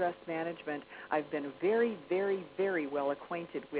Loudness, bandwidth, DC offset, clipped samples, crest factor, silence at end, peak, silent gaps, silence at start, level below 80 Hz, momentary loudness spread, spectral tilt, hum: -35 LUFS; 4 kHz; under 0.1%; under 0.1%; 16 dB; 0 s; -18 dBFS; none; 0 s; -76 dBFS; 8 LU; -4 dB/octave; none